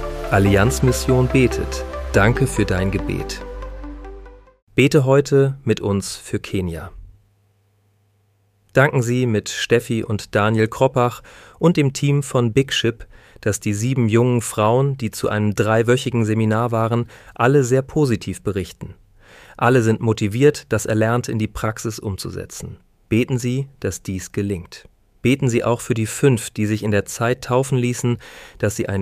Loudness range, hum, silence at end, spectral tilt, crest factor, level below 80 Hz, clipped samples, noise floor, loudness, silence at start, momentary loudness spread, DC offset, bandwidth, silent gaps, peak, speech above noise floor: 5 LU; none; 0 s; -6 dB/octave; 18 dB; -38 dBFS; under 0.1%; -61 dBFS; -19 LUFS; 0 s; 12 LU; under 0.1%; 15.5 kHz; 4.62-4.67 s; -2 dBFS; 43 dB